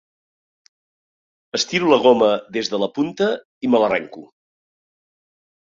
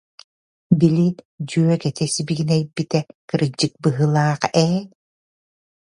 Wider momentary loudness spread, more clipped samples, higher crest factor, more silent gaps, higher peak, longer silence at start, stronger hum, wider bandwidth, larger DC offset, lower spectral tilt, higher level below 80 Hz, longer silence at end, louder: first, 10 LU vs 7 LU; neither; about the same, 20 dB vs 20 dB; second, 3.45-3.61 s vs 1.25-1.38 s, 3.15-3.28 s; about the same, -2 dBFS vs 0 dBFS; first, 1.55 s vs 0.7 s; neither; second, 7.6 kHz vs 11 kHz; neither; second, -4 dB/octave vs -6 dB/octave; second, -64 dBFS vs -58 dBFS; first, 1.45 s vs 1.1 s; about the same, -19 LUFS vs -20 LUFS